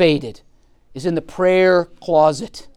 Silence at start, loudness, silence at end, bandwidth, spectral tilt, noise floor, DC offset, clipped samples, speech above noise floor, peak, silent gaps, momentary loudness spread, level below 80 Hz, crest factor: 0 s; -17 LUFS; 0.1 s; 11 kHz; -6 dB/octave; -49 dBFS; under 0.1%; under 0.1%; 32 dB; -2 dBFS; none; 14 LU; -50 dBFS; 16 dB